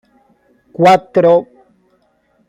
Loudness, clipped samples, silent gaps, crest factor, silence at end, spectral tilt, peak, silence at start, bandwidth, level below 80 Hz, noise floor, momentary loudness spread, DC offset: -11 LUFS; under 0.1%; none; 16 dB; 1.05 s; -6.5 dB/octave; 0 dBFS; 0.8 s; 12 kHz; -58 dBFS; -58 dBFS; 7 LU; under 0.1%